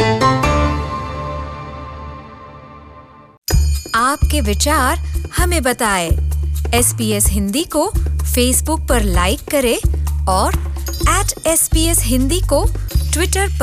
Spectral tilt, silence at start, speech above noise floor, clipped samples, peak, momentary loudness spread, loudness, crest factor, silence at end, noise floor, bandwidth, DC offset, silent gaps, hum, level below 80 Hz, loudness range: -4 dB/octave; 0 s; 25 dB; under 0.1%; -2 dBFS; 12 LU; -16 LUFS; 14 dB; 0 s; -40 dBFS; 16 kHz; under 0.1%; 3.38-3.42 s; none; -20 dBFS; 5 LU